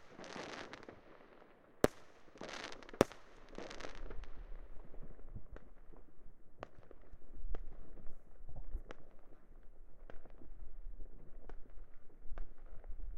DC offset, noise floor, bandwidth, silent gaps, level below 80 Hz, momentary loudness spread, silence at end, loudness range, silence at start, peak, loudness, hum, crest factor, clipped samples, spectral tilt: under 0.1%; -61 dBFS; 13.5 kHz; none; -50 dBFS; 27 LU; 0 s; 17 LU; 0 s; -10 dBFS; -45 LUFS; none; 32 dB; under 0.1%; -5 dB/octave